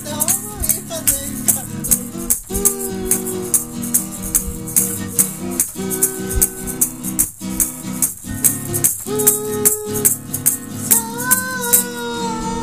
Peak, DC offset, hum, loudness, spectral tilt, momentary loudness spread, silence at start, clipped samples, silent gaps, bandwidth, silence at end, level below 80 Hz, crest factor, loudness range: 0 dBFS; 0.4%; none; -17 LUFS; -2.5 dB/octave; 5 LU; 0 s; under 0.1%; none; over 20 kHz; 0 s; -36 dBFS; 20 dB; 2 LU